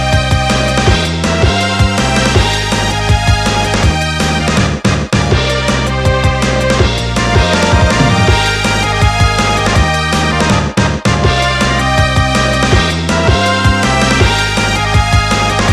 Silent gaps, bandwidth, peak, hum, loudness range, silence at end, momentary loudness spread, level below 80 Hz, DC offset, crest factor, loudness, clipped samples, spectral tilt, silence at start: none; 14 kHz; 0 dBFS; none; 2 LU; 0 s; 3 LU; -18 dBFS; under 0.1%; 10 dB; -11 LUFS; under 0.1%; -4.5 dB/octave; 0 s